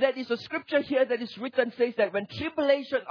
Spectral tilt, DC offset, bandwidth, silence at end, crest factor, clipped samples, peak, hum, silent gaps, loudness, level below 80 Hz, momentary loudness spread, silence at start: -6 dB/octave; under 0.1%; 5.4 kHz; 0 s; 16 dB; under 0.1%; -10 dBFS; none; none; -28 LUFS; -66 dBFS; 6 LU; 0 s